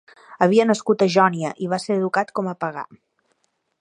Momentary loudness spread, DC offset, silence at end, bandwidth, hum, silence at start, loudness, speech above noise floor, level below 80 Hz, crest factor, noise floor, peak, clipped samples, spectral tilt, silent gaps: 12 LU; under 0.1%; 0.85 s; 10.5 kHz; none; 0.3 s; -20 LUFS; 50 dB; -72 dBFS; 20 dB; -69 dBFS; -2 dBFS; under 0.1%; -5.5 dB/octave; none